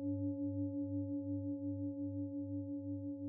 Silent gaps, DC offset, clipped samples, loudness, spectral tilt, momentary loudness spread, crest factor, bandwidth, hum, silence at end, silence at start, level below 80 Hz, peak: none; under 0.1%; under 0.1%; -42 LUFS; -11.5 dB/octave; 3 LU; 10 dB; 0.9 kHz; none; 0 s; 0 s; -80 dBFS; -30 dBFS